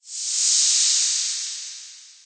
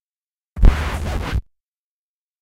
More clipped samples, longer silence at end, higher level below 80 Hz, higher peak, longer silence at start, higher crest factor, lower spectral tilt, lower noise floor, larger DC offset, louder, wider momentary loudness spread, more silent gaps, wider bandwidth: neither; second, 0.15 s vs 1 s; second, under -90 dBFS vs -22 dBFS; second, -8 dBFS vs 0 dBFS; second, 0.05 s vs 0.55 s; about the same, 16 dB vs 20 dB; second, 8.5 dB/octave vs -6.5 dB/octave; second, -42 dBFS vs under -90 dBFS; neither; first, -18 LUFS vs -22 LUFS; first, 17 LU vs 10 LU; neither; second, 9.6 kHz vs 12.5 kHz